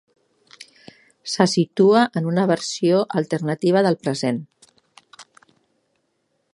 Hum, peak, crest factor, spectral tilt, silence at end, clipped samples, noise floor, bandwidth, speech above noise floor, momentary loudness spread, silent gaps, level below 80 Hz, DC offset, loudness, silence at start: none; 0 dBFS; 22 dB; -5.5 dB/octave; 1.3 s; under 0.1%; -71 dBFS; 11.5 kHz; 52 dB; 9 LU; none; -70 dBFS; under 0.1%; -20 LUFS; 0.6 s